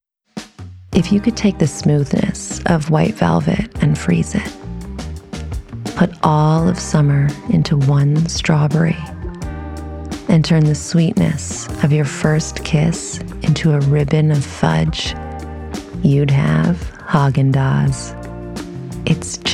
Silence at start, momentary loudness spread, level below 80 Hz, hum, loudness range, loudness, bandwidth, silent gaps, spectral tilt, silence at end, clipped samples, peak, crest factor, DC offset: 0.35 s; 15 LU; -34 dBFS; none; 2 LU; -16 LUFS; 11.5 kHz; none; -6 dB/octave; 0 s; under 0.1%; 0 dBFS; 16 dB; under 0.1%